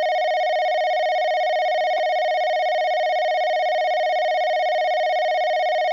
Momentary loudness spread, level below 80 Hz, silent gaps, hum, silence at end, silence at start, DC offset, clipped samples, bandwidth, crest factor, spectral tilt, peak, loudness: 0 LU; -88 dBFS; none; none; 0 s; 0 s; under 0.1%; under 0.1%; 7.2 kHz; 4 dB; 0.5 dB/octave; -16 dBFS; -21 LUFS